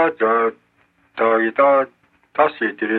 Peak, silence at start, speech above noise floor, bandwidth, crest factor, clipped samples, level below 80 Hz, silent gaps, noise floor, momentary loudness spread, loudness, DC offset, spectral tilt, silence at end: -4 dBFS; 0 s; 43 dB; 4.4 kHz; 16 dB; under 0.1%; -68 dBFS; none; -60 dBFS; 12 LU; -18 LUFS; under 0.1%; -7.5 dB/octave; 0 s